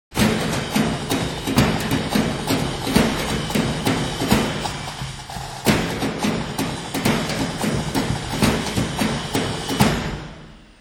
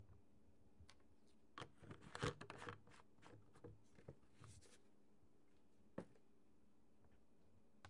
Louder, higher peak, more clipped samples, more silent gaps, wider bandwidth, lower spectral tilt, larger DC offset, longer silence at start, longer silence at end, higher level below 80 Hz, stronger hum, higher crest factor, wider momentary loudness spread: first, -22 LUFS vs -57 LUFS; first, -2 dBFS vs -32 dBFS; neither; neither; first, 19.5 kHz vs 11 kHz; about the same, -4.5 dB/octave vs -5 dB/octave; neither; about the same, 0.1 s vs 0 s; first, 0.15 s vs 0 s; first, -36 dBFS vs -76 dBFS; neither; second, 20 dB vs 28 dB; second, 8 LU vs 18 LU